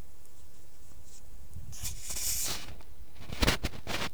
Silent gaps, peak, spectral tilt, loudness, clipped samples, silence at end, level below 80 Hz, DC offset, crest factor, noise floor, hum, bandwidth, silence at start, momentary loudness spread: none; -10 dBFS; -2.5 dB/octave; -33 LUFS; under 0.1%; 0 s; -44 dBFS; 2%; 26 dB; -57 dBFS; none; over 20 kHz; 0 s; 24 LU